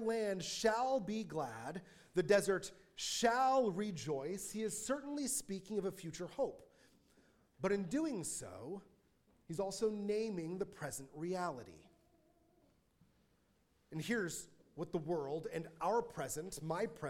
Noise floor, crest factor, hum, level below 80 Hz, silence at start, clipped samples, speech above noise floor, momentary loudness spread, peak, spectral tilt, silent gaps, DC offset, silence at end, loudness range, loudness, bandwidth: -76 dBFS; 22 dB; none; -70 dBFS; 0 s; under 0.1%; 37 dB; 14 LU; -18 dBFS; -4 dB/octave; none; under 0.1%; 0 s; 10 LU; -39 LUFS; 17 kHz